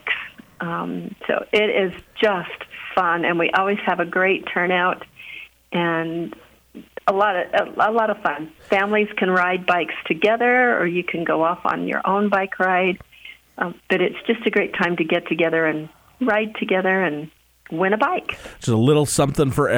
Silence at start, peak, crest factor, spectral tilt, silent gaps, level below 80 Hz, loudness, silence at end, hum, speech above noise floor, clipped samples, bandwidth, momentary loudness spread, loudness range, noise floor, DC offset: 0.05 s; -4 dBFS; 18 dB; -5 dB/octave; none; -54 dBFS; -20 LUFS; 0 s; none; 24 dB; under 0.1%; over 20 kHz; 13 LU; 3 LU; -44 dBFS; under 0.1%